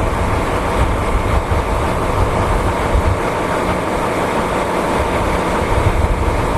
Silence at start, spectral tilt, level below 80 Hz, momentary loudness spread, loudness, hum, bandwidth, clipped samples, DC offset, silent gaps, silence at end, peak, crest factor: 0 s; -6 dB/octave; -22 dBFS; 1 LU; -17 LUFS; none; 14 kHz; under 0.1%; 0.2%; none; 0 s; -2 dBFS; 14 dB